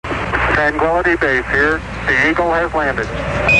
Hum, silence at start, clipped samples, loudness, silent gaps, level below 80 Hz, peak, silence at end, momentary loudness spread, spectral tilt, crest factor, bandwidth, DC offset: none; 0.05 s; under 0.1%; -15 LUFS; none; -30 dBFS; 0 dBFS; 0 s; 6 LU; -5.5 dB/octave; 14 dB; 11 kHz; 0.4%